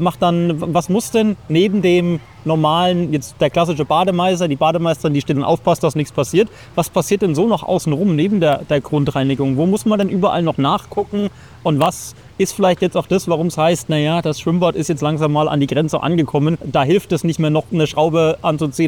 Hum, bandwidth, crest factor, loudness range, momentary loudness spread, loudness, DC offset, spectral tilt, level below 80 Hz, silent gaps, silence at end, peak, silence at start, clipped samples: none; 18.5 kHz; 14 dB; 2 LU; 5 LU; -17 LUFS; 0.2%; -6 dB/octave; -46 dBFS; none; 0 s; -4 dBFS; 0 s; under 0.1%